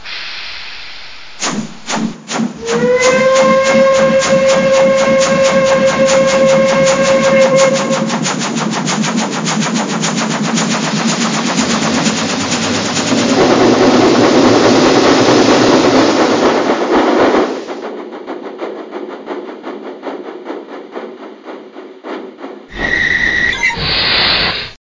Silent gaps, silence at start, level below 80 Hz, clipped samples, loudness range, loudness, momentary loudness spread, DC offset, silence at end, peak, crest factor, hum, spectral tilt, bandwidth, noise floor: none; 0 s; -42 dBFS; under 0.1%; 16 LU; -11 LUFS; 18 LU; under 0.1%; 0.05 s; 0 dBFS; 12 dB; none; -3.5 dB/octave; 7.6 kHz; -33 dBFS